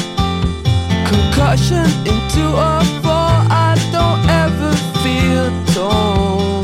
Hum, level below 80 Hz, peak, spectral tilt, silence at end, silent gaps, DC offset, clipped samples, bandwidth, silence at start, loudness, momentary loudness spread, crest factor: none; -24 dBFS; 0 dBFS; -6 dB/octave; 0 s; none; under 0.1%; under 0.1%; 16 kHz; 0 s; -14 LUFS; 4 LU; 14 dB